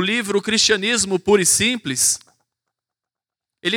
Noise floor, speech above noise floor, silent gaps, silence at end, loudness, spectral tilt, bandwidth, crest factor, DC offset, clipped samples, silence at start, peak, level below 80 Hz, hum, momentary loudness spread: -88 dBFS; 70 dB; none; 0 s; -17 LUFS; -2 dB/octave; 19.5 kHz; 16 dB; under 0.1%; under 0.1%; 0 s; -4 dBFS; -54 dBFS; none; 5 LU